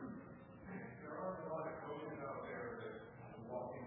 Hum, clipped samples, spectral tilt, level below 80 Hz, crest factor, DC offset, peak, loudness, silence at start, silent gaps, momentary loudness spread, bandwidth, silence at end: none; under 0.1%; -3.5 dB/octave; -74 dBFS; 16 dB; under 0.1%; -34 dBFS; -49 LUFS; 0 s; none; 9 LU; 3.7 kHz; 0 s